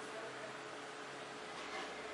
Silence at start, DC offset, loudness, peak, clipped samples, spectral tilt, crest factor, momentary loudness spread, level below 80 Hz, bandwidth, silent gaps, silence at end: 0 s; under 0.1%; -47 LUFS; -32 dBFS; under 0.1%; -2.5 dB/octave; 16 dB; 3 LU; -82 dBFS; 11.5 kHz; none; 0 s